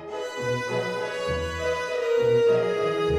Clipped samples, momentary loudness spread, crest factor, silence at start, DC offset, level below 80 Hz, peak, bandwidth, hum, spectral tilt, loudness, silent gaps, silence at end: under 0.1%; 8 LU; 12 dB; 0 s; under 0.1%; -46 dBFS; -12 dBFS; 13 kHz; none; -5 dB/octave; -25 LUFS; none; 0 s